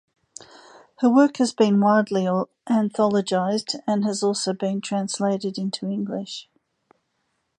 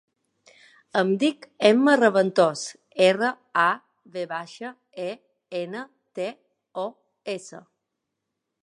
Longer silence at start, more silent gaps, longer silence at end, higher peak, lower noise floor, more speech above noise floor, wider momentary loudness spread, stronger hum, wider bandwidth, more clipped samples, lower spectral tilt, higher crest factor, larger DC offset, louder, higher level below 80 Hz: about the same, 1 s vs 0.95 s; neither; about the same, 1.15 s vs 1.05 s; about the same, -4 dBFS vs -4 dBFS; second, -73 dBFS vs -82 dBFS; second, 52 dB vs 59 dB; second, 10 LU vs 19 LU; neither; about the same, 10.5 kHz vs 11.5 kHz; neither; about the same, -5.5 dB/octave vs -4.5 dB/octave; about the same, 18 dB vs 22 dB; neither; about the same, -22 LUFS vs -24 LUFS; first, -70 dBFS vs -80 dBFS